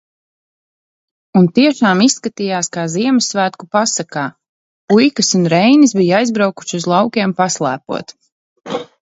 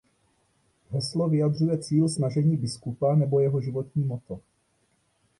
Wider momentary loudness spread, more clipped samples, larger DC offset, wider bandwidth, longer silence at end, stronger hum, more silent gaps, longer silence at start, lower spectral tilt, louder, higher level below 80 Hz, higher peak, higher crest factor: about the same, 12 LU vs 10 LU; neither; neither; second, 8 kHz vs 11 kHz; second, 0.2 s vs 1 s; neither; first, 4.49-4.88 s, 8.32-8.56 s vs none; first, 1.35 s vs 0.9 s; second, -4.5 dB/octave vs -7.5 dB/octave; first, -14 LUFS vs -26 LUFS; about the same, -62 dBFS vs -62 dBFS; first, 0 dBFS vs -12 dBFS; about the same, 14 dB vs 14 dB